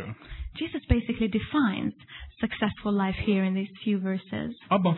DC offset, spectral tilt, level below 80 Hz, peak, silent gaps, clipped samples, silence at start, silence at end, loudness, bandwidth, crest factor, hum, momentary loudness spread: under 0.1%; -10.5 dB/octave; -40 dBFS; -6 dBFS; none; under 0.1%; 0 s; 0 s; -28 LUFS; 4.2 kHz; 20 dB; none; 12 LU